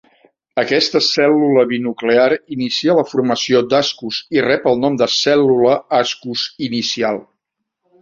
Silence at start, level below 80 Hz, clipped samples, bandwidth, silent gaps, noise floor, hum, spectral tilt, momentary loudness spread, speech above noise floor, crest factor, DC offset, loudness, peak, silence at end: 0.55 s; -58 dBFS; under 0.1%; 7.6 kHz; none; -76 dBFS; none; -4 dB/octave; 8 LU; 61 dB; 16 dB; under 0.1%; -15 LUFS; 0 dBFS; 0.8 s